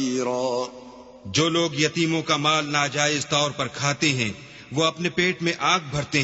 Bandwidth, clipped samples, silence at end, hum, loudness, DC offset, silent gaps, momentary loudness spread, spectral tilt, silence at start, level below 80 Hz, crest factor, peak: 8.2 kHz; under 0.1%; 0 s; none; -23 LUFS; under 0.1%; none; 8 LU; -3.5 dB/octave; 0 s; -58 dBFS; 20 dB; -4 dBFS